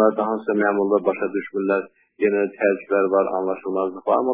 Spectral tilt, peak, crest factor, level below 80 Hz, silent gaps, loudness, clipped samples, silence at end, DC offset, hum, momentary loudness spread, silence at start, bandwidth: -11 dB/octave; -4 dBFS; 16 dB; -70 dBFS; none; -22 LUFS; under 0.1%; 0 s; under 0.1%; none; 6 LU; 0 s; 4 kHz